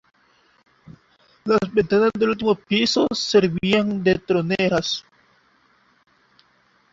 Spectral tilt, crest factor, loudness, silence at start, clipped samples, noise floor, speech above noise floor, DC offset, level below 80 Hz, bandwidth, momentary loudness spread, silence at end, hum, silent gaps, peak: -5 dB/octave; 20 dB; -20 LUFS; 1.45 s; under 0.1%; -61 dBFS; 41 dB; under 0.1%; -54 dBFS; 7.8 kHz; 4 LU; 1.9 s; none; none; -4 dBFS